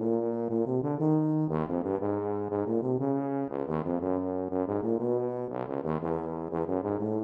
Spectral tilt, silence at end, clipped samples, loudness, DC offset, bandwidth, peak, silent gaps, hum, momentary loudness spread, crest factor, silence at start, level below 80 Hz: -11.5 dB/octave; 0 s; under 0.1%; -30 LUFS; under 0.1%; 4.3 kHz; -16 dBFS; none; none; 5 LU; 14 dB; 0 s; -60 dBFS